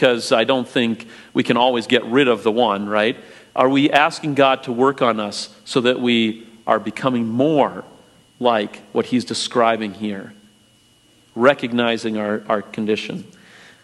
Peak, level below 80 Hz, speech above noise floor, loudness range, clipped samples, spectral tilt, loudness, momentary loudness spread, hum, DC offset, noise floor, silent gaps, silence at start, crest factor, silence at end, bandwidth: 0 dBFS; -66 dBFS; 36 dB; 4 LU; under 0.1%; -5 dB/octave; -19 LUFS; 10 LU; none; under 0.1%; -54 dBFS; none; 0 s; 20 dB; 0.6 s; 12 kHz